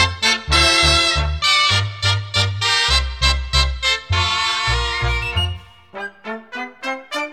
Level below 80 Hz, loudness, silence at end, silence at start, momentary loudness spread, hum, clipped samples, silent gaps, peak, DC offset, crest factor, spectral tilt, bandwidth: -26 dBFS; -16 LUFS; 0 s; 0 s; 16 LU; none; under 0.1%; none; 0 dBFS; 0.2%; 18 dB; -2.5 dB/octave; 14.5 kHz